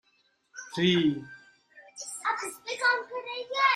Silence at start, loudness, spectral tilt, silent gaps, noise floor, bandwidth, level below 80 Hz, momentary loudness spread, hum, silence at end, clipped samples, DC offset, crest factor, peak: 0.55 s; -29 LUFS; -4 dB/octave; none; -70 dBFS; 15.5 kHz; -70 dBFS; 21 LU; none; 0 s; under 0.1%; under 0.1%; 18 dB; -12 dBFS